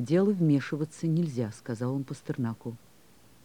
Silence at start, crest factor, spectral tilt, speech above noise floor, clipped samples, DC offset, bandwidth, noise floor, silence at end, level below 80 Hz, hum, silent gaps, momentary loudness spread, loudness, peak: 0 s; 14 dB; -8 dB/octave; 31 dB; under 0.1%; 0.1%; 13.5 kHz; -59 dBFS; 0.65 s; -70 dBFS; none; none; 13 LU; -30 LUFS; -14 dBFS